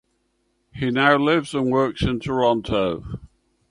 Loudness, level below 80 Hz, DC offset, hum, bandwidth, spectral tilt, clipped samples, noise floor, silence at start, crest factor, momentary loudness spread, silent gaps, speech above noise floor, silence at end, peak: -21 LUFS; -42 dBFS; under 0.1%; none; 11.5 kHz; -6.5 dB/octave; under 0.1%; -69 dBFS; 0.75 s; 20 dB; 12 LU; none; 49 dB; 0.45 s; -4 dBFS